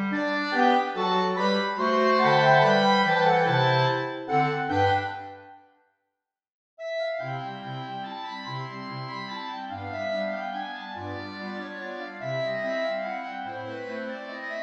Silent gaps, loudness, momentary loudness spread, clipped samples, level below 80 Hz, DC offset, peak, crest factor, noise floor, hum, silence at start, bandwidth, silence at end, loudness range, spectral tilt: 6.52-6.77 s; -26 LUFS; 15 LU; under 0.1%; -74 dBFS; under 0.1%; -6 dBFS; 20 dB; -85 dBFS; none; 0 s; 8.4 kHz; 0 s; 13 LU; -6 dB/octave